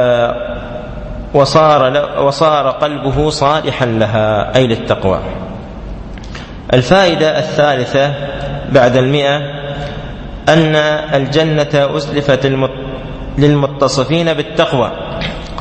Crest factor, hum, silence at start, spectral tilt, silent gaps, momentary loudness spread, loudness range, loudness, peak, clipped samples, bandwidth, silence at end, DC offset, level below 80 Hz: 14 dB; none; 0 s; -6 dB/octave; none; 16 LU; 2 LU; -13 LUFS; 0 dBFS; under 0.1%; 8.8 kHz; 0 s; under 0.1%; -32 dBFS